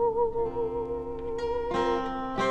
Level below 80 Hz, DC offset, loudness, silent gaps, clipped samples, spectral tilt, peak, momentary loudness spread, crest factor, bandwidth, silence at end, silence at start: -46 dBFS; under 0.1%; -30 LUFS; none; under 0.1%; -6 dB/octave; -14 dBFS; 6 LU; 14 dB; 8.6 kHz; 0 s; 0 s